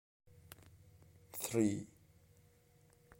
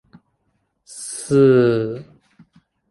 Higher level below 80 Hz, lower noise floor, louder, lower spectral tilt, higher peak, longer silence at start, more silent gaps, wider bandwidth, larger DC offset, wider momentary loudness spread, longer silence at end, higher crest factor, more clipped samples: second, -72 dBFS vs -58 dBFS; about the same, -68 dBFS vs -69 dBFS; second, -38 LUFS vs -17 LUFS; about the same, -5.5 dB/octave vs -6.5 dB/octave; second, -20 dBFS vs -4 dBFS; second, 0.65 s vs 0.95 s; neither; first, 16.5 kHz vs 11.5 kHz; neither; first, 24 LU vs 21 LU; first, 1.35 s vs 0.9 s; first, 24 dB vs 18 dB; neither